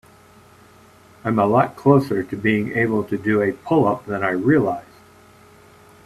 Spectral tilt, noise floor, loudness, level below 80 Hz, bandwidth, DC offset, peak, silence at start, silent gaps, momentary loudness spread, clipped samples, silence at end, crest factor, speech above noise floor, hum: -8.5 dB/octave; -49 dBFS; -19 LUFS; -56 dBFS; 14 kHz; under 0.1%; 0 dBFS; 1.25 s; none; 7 LU; under 0.1%; 1.25 s; 20 dB; 30 dB; none